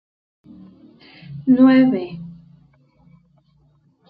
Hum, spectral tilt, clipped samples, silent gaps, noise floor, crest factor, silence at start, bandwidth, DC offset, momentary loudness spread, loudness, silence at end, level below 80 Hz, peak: none; -10 dB/octave; under 0.1%; none; -58 dBFS; 18 dB; 1.3 s; 4.9 kHz; under 0.1%; 25 LU; -15 LUFS; 1.8 s; -60 dBFS; -4 dBFS